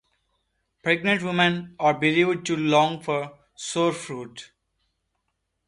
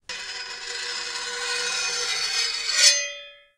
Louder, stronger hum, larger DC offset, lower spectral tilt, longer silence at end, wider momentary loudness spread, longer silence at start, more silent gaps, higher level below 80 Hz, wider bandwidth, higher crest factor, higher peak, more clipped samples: about the same, -23 LUFS vs -23 LUFS; neither; neither; first, -4.5 dB/octave vs 3.5 dB/octave; first, 1.25 s vs 0.2 s; about the same, 15 LU vs 15 LU; first, 0.85 s vs 0.1 s; neither; about the same, -66 dBFS vs -64 dBFS; second, 11.5 kHz vs 16 kHz; about the same, 20 dB vs 24 dB; second, -6 dBFS vs -2 dBFS; neither